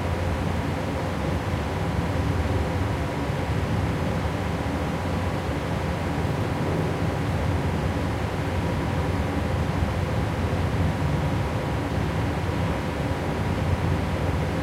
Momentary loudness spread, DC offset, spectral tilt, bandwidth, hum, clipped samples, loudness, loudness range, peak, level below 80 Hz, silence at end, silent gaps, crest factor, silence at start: 2 LU; under 0.1%; -7 dB/octave; 15.5 kHz; none; under 0.1%; -26 LUFS; 1 LU; -10 dBFS; -36 dBFS; 0 s; none; 14 dB; 0 s